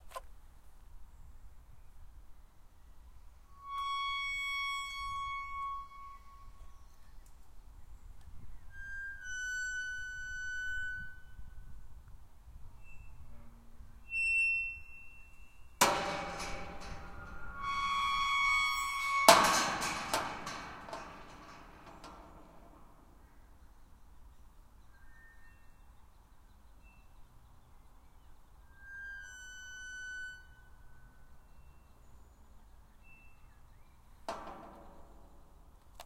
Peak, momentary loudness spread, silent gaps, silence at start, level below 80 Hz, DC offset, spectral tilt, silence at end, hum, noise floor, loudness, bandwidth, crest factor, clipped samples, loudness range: -4 dBFS; 28 LU; none; 0 s; -56 dBFS; under 0.1%; -1.5 dB/octave; 0 s; none; -58 dBFS; -34 LUFS; 16 kHz; 36 dB; under 0.1%; 23 LU